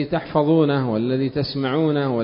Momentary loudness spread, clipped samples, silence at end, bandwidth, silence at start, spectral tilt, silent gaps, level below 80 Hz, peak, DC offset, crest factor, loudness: 5 LU; under 0.1%; 0 s; 5.4 kHz; 0 s; -12 dB/octave; none; -52 dBFS; -4 dBFS; under 0.1%; 16 dB; -20 LUFS